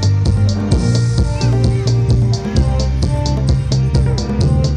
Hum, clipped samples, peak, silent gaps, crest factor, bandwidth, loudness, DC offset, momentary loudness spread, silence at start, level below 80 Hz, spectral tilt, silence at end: none; under 0.1%; -2 dBFS; none; 12 dB; 9.8 kHz; -15 LUFS; under 0.1%; 2 LU; 0 s; -20 dBFS; -7 dB/octave; 0 s